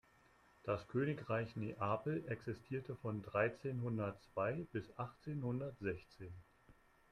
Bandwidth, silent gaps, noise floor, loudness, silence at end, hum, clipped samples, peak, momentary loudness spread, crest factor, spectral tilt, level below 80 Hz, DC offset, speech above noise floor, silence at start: 11 kHz; none; -70 dBFS; -43 LUFS; 0.4 s; none; under 0.1%; -22 dBFS; 9 LU; 22 dB; -8.5 dB/octave; -70 dBFS; under 0.1%; 28 dB; 0.65 s